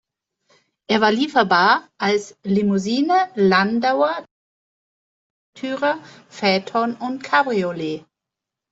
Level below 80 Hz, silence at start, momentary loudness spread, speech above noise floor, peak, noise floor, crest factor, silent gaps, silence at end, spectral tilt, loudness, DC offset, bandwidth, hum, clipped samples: -64 dBFS; 0.9 s; 12 LU; 66 dB; -2 dBFS; -85 dBFS; 18 dB; 4.31-5.53 s; 0.75 s; -5.5 dB/octave; -19 LUFS; under 0.1%; 8 kHz; none; under 0.1%